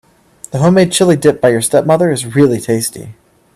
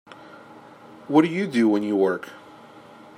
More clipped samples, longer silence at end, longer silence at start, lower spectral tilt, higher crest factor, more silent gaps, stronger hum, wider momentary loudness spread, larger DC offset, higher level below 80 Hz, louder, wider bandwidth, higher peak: neither; about the same, 0.45 s vs 0.4 s; first, 0.55 s vs 0.2 s; second, -5.5 dB/octave vs -7 dB/octave; second, 12 dB vs 20 dB; neither; neither; second, 8 LU vs 22 LU; neither; first, -50 dBFS vs -76 dBFS; first, -12 LUFS vs -22 LUFS; first, 14.5 kHz vs 10.5 kHz; first, 0 dBFS vs -4 dBFS